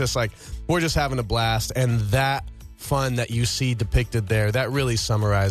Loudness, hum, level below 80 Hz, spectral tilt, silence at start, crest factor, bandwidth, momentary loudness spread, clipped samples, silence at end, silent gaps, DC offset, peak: -23 LUFS; none; -34 dBFS; -5 dB/octave; 0 s; 14 dB; 14 kHz; 5 LU; under 0.1%; 0 s; none; under 0.1%; -8 dBFS